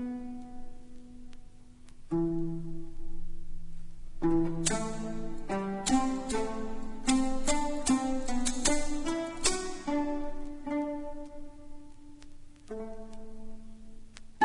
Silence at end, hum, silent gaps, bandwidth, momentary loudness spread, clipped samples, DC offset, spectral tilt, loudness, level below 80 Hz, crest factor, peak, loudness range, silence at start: 0 s; none; none; 11 kHz; 24 LU; under 0.1%; under 0.1%; -4 dB/octave; -32 LUFS; -42 dBFS; 22 dB; -10 dBFS; 11 LU; 0 s